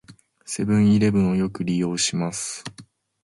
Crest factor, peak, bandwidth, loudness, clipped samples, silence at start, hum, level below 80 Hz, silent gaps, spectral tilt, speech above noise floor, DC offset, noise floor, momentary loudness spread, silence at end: 14 dB; -10 dBFS; 11.5 kHz; -22 LUFS; under 0.1%; 0.1 s; none; -50 dBFS; none; -5 dB/octave; 28 dB; under 0.1%; -49 dBFS; 14 LU; 0.4 s